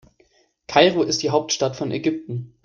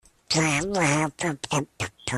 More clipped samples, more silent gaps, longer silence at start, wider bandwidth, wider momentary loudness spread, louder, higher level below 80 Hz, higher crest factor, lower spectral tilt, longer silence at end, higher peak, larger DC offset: neither; neither; first, 0.7 s vs 0.3 s; second, 10 kHz vs 14 kHz; about the same, 9 LU vs 8 LU; first, -20 LUFS vs -25 LUFS; second, -60 dBFS vs -54 dBFS; about the same, 20 dB vs 18 dB; about the same, -4 dB/octave vs -4 dB/octave; first, 0.2 s vs 0 s; first, -2 dBFS vs -8 dBFS; neither